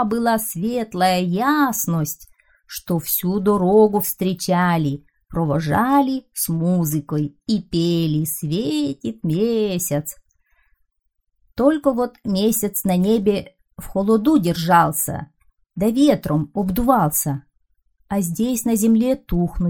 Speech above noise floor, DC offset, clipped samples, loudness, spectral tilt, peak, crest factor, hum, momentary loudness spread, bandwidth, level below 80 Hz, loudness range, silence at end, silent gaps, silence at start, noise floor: 52 dB; 0.1%; under 0.1%; -19 LUFS; -5.5 dB/octave; -2 dBFS; 18 dB; none; 9 LU; over 20 kHz; -42 dBFS; 4 LU; 0 s; none; 0 s; -71 dBFS